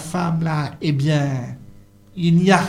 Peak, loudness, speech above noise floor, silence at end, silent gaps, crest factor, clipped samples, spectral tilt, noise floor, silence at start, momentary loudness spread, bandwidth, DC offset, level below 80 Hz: 0 dBFS; -20 LUFS; 27 dB; 0 s; none; 18 dB; under 0.1%; -6.5 dB/octave; -45 dBFS; 0 s; 17 LU; 12 kHz; under 0.1%; -52 dBFS